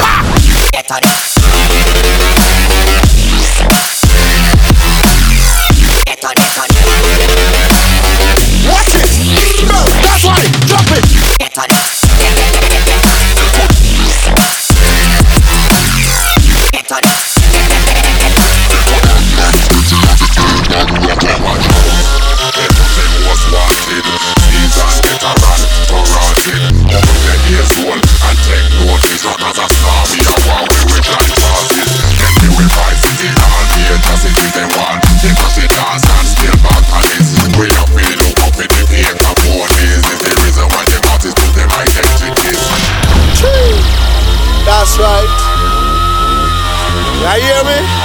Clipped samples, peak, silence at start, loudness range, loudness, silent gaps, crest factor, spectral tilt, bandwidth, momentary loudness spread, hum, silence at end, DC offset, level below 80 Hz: 0.4%; 0 dBFS; 0 s; 2 LU; -8 LUFS; none; 8 dB; -3.5 dB/octave; over 20 kHz; 3 LU; none; 0 s; under 0.1%; -10 dBFS